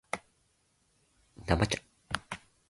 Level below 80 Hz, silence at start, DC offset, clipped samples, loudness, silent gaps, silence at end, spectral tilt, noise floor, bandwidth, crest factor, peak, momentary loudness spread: -48 dBFS; 0.15 s; under 0.1%; under 0.1%; -34 LUFS; none; 0.35 s; -4.5 dB/octave; -73 dBFS; 11.5 kHz; 26 dB; -10 dBFS; 14 LU